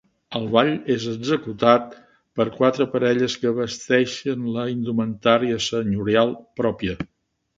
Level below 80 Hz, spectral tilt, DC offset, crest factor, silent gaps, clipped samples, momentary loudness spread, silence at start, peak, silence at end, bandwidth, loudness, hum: -54 dBFS; -5.5 dB/octave; under 0.1%; 22 dB; none; under 0.1%; 9 LU; 0.3 s; 0 dBFS; 0.55 s; 7.8 kHz; -22 LUFS; none